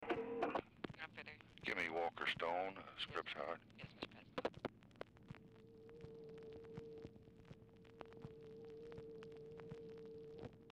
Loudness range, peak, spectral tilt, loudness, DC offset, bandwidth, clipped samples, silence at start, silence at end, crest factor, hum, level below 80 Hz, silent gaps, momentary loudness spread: 13 LU; -30 dBFS; -5.5 dB/octave; -48 LUFS; under 0.1%; 13 kHz; under 0.1%; 0 s; 0 s; 20 dB; none; -74 dBFS; none; 18 LU